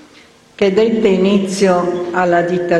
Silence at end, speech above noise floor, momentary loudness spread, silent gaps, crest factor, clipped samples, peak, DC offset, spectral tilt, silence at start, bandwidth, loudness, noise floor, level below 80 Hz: 0 s; 32 dB; 4 LU; none; 14 dB; under 0.1%; 0 dBFS; under 0.1%; -6 dB/octave; 0.6 s; 12 kHz; -14 LUFS; -45 dBFS; -50 dBFS